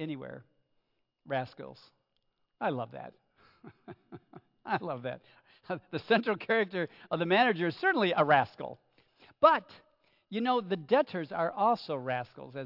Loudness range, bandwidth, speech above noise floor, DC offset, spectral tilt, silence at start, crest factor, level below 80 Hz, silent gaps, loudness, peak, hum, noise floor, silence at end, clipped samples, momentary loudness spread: 12 LU; 5.8 kHz; 47 dB; under 0.1%; -8 dB/octave; 0 s; 24 dB; -80 dBFS; none; -30 LUFS; -10 dBFS; none; -78 dBFS; 0 s; under 0.1%; 22 LU